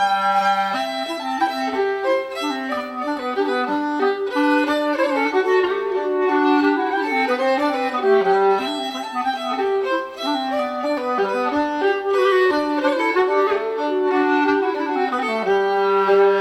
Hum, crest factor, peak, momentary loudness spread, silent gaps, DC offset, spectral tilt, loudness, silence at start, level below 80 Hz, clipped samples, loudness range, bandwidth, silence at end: none; 14 dB; -6 dBFS; 7 LU; none; under 0.1%; -4 dB/octave; -20 LUFS; 0 s; -62 dBFS; under 0.1%; 3 LU; 12.5 kHz; 0 s